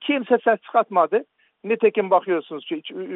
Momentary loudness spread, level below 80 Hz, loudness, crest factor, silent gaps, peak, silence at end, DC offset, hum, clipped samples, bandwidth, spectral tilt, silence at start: 11 LU; -74 dBFS; -21 LUFS; 16 dB; none; -4 dBFS; 0 s; under 0.1%; none; under 0.1%; 4 kHz; -3 dB/octave; 0 s